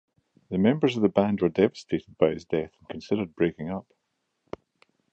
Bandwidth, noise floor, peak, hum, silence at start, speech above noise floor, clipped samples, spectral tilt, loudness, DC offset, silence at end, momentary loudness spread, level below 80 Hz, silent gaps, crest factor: 8 kHz; -78 dBFS; -6 dBFS; none; 0.5 s; 53 dB; under 0.1%; -7.5 dB/octave; -26 LUFS; under 0.1%; 1.3 s; 18 LU; -58 dBFS; none; 20 dB